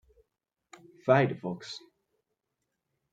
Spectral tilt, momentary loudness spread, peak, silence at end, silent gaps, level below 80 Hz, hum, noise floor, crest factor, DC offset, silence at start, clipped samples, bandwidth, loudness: -7 dB/octave; 18 LU; -8 dBFS; 1.35 s; none; -76 dBFS; none; -84 dBFS; 26 dB; under 0.1%; 1.05 s; under 0.1%; 9 kHz; -28 LUFS